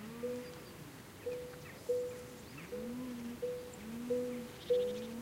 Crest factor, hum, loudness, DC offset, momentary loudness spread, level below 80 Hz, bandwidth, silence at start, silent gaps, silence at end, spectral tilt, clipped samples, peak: 18 dB; none; -41 LUFS; under 0.1%; 14 LU; -66 dBFS; 16 kHz; 0 s; none; 0 s; -5 dB/octave; under 0.1%; -24 dBFS